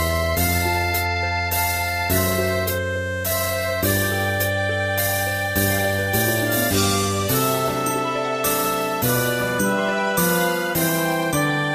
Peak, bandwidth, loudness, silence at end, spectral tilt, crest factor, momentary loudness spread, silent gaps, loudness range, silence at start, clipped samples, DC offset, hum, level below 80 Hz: -6 dBFS; 15.5 kHz; -20 LUFS; 0 s; -4 dB/octave; 16 dB; 3 LU; none; 1 LU; 0 s; under 0.1%; under 0.1%; none; -40 dBFS